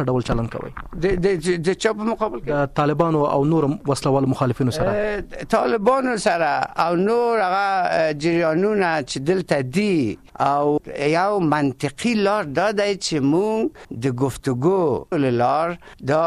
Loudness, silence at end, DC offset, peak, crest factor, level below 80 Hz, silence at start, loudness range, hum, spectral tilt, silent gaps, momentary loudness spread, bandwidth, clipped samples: -20 LUFS; 0 s; under 0.1%; -6 dBFS; 14 dB; -42 dBFS; 0 s; 2 LU; none; -6 dB/octave; none; 5 LU; 14 kHz; under 0.1%